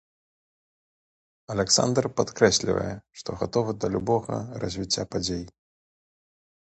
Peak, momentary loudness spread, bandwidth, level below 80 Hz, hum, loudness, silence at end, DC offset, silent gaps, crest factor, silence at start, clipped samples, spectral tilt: -4 dBFS; 13 LU; 9 kHz; -52 dBFS; none; -25 LUFS; 1.2 s; under 0.1%; none; 24 dB; 1.5 s; under 0.1%; -4 dB/octave